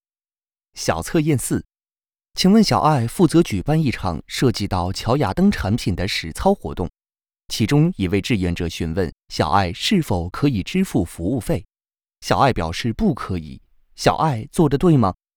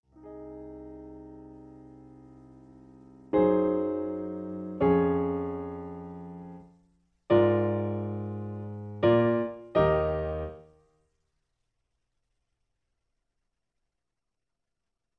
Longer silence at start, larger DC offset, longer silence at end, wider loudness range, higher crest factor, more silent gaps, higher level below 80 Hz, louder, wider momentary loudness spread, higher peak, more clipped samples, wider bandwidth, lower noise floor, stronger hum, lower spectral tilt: first, 0.75 s vs 0.2 s; neither; second, 0.25 s vs 4.55 s; second, 3 LU vs 8 LU; about the same, 18 dB vs 20 dB; neither; first, -38 dBFS vs -52 dBFS; first, -20 LUFS vs -28 LUFS; second, 10 LU vs 22 LU; first, -2 dBFS vs -10 dBFS; neither; first, over 20 kHz vs 4.7 kHz; about the same, under -90 dBFS vs -87 dBFS; neither; second, -6 dB/octave vs -10.5 dB/octave